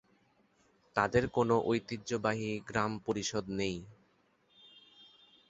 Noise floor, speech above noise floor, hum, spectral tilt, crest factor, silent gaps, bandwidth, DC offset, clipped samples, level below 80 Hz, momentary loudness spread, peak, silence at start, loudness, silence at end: -71 dBFS; 38 dB; none; -5 dB/octave; 24 dB; none; 8 kHz; under 0.1%; under 0.1%; -60 dBFS; 7 LU; -12 dBFS; 0.95 s; -33 LUFS; 0.45 s